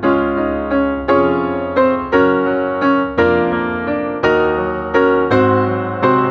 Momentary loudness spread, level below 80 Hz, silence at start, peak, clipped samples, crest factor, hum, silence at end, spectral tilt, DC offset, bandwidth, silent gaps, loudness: 5 LU; -40 dBFS; 0 s; 0 dBFS; under 0.1%; 14 dB; none; 0 s; -8 dB/octave; under 0.1%; 6.4 kHz; none; -15 LUFS